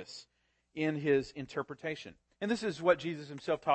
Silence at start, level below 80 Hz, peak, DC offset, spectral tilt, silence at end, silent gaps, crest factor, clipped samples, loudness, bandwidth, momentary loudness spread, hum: 0 s; -68 dBFS; -14 dBFS; under 0.1%; -6 dB/octave; 0 s; none; 20 dB; under 0.1%; -34 LUFS; 8.8 kHz; 18 LU; none